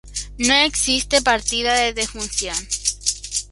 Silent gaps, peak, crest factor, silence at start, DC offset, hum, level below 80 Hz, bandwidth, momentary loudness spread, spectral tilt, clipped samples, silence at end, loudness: none; 0 dBFS; 20 dB; 0.05 s; under 0.1%; 50 Hz at -40 dBFS; -38 dBFS; 12 kHz; 8 LU; -0.5 dB/octave; under 0.1%; 0 s; -18 LUFS